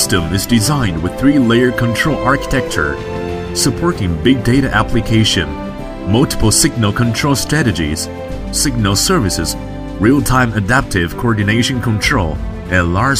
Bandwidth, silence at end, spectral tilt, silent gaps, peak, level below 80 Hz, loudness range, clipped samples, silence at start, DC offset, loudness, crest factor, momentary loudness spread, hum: 16 kHz; 0 s; -4.5 dB/octave; none; 0 dBFS; -28 dBFS; 1 LU; under 0.1%; 0 s; under 0.1%; -14 LUFS; 14 dB; 9 LU; none